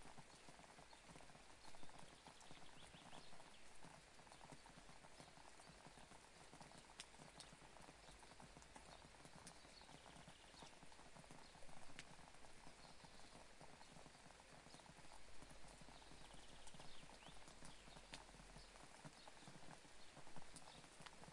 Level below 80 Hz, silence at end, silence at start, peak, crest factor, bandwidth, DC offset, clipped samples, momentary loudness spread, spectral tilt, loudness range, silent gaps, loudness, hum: -74 dBFS; 0 s; 0 s; -34 dBFS; 24 dB; 11.5 kHz; under 0.1%; under 0.1%; 3 LU; -3 dB/octave; 2 LU; none; -63 LUFS; none